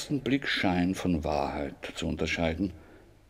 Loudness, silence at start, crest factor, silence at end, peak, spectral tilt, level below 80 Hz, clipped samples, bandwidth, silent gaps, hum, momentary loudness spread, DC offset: -30 LUFS; 0 s; 18 dB; 0.3 s; -12 dBFS; -5.5 dB/octave; -46 dBFS; under 0.1%; 15 kHz; none; none; 8 LU; under 0.1%